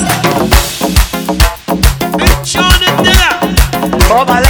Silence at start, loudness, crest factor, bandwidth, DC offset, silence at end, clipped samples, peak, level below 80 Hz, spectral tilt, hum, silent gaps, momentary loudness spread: 0 s; -10 LUFS; 10 dB; over 20 kHz; under 0.1%; 0 s; 2%; 0 dBFS; -14 dBFS; -4 dB/octave; none; none; 5 LU